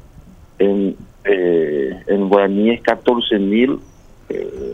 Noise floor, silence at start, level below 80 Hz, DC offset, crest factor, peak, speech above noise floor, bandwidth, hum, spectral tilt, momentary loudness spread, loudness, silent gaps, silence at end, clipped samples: -42 dBFS; 0.2 s; -46 dBFS; under 0.1%; 16 dB; 0 dBFS; 26 dB; 7.2 kHz; none; -7.5 dB/octave; 11 LU; -17 LUFS; none; 0 s; under 0.1%